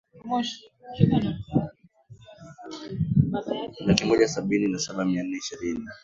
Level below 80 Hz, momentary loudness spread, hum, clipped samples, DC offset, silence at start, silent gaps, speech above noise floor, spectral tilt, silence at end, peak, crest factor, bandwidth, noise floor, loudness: -50 dBFS; 16 LU; none; under 0.1%; under 0.1%; 0.15 s; none; 26 dB; -6 dB/octave; 0.05 s; 0 dBFS; 26 dB; 7.8 kHz; -52 dBFS; -26 LUFS